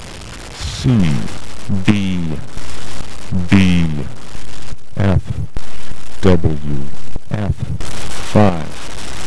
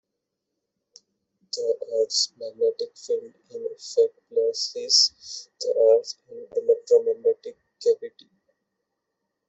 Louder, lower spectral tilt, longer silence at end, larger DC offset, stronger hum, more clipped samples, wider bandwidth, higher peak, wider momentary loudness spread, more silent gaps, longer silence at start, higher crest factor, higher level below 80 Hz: first, -18 LUFS vs -23 LUFS; first, -6.5 dB/octave vs 0 dB/octave; second, 0 s vs 1.4 s; first, 20% vs under 0.1%; neither; neither; first, 11 kHz vs 8.2 kHz; first, 0 dBFS vs -6 dBFS; about the same, 19 LU vs 17 LU; neither; second, 0 s vs 1.55 s; about the same, 16 dB vs 20 dB; first, -30 dBFS vs -78 dBFS